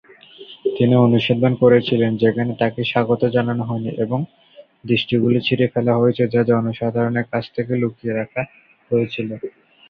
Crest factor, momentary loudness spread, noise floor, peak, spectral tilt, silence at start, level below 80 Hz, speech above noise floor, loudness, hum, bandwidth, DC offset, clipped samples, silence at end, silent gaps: 16 dB; 12 LU; -42 dBFS; -2 dBFS; -9.5 dB/octave; 0.4 s; -54 dBFS; 24 dB; -19 LUFS; none; 5.2 kHz; under 0.1%; under 0.1%; 0.4 s; none